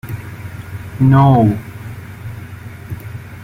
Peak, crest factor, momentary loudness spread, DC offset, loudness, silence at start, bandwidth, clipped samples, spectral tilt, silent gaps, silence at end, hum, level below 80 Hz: -2 dBFS; 16 dB; 21 LU; under 0.1%; -12 LUFS; 0.05 s; 15.5 kHz; under 0.1%; -9 dB/octave; none; 0 s; none; -42 dBFS